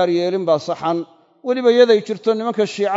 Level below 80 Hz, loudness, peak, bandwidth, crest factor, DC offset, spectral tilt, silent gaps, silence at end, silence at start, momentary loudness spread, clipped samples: -74 dBFS; -17 LUFS; 0 dBFS; 7.8 kHz; 16 dB; under 0.1%; -5.5 dB/octave; none; 0 s; 0 s; 11 LU; under 0.1%